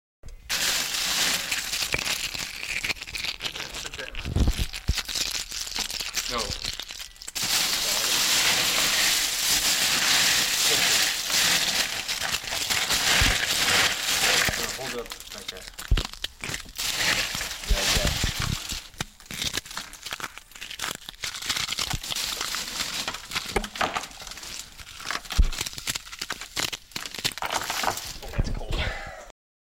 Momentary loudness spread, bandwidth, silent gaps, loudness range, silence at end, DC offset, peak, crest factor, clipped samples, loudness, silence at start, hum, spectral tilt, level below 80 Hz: 14 LU; 16.5 kHz; none; 10 LU; 0.45 s; under 0.1%; -8 dBFS; 20 dB; under 0.1%; -25 LUFS; 0.25 s; none; -1 dB/octave; -36 dBFS